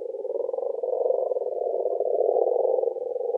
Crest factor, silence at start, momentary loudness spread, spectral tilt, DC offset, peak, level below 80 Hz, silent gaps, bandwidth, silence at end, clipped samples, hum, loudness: 16 dB; 0 s; 6 LU; -8 dB/octave; under 0.1%; -8 dBFS; under -90 dBFS; none; 1.1 kHz; 0 s; under 0.1%; none; -26 LUFS